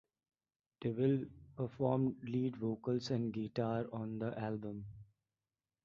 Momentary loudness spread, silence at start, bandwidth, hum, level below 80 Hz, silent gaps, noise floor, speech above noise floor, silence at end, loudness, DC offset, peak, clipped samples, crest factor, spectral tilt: 9 LU; 0.8 s; 7 kHz; none; -70 dBFS; none; under -90 dBFS; over 53 dB; 0.8 s; -39 LUFS; under 0.1%; -20 dBFS; under 0.1%; 20 dB; -7.5 dB/octave